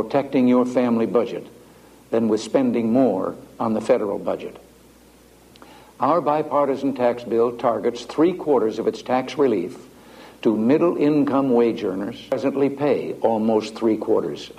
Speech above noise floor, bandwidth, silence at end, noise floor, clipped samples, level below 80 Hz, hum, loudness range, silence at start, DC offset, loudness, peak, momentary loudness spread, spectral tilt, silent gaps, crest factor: 30 dB; 14.5 kHz; 0.05 s; -50 dBFS; under 0.1%; -60 dBFS; none; 3 LU; 0 s; under 0.1%; -21 LUFS; -4 dBFS; 8 LU; -7 dB/octave; none; 16 dB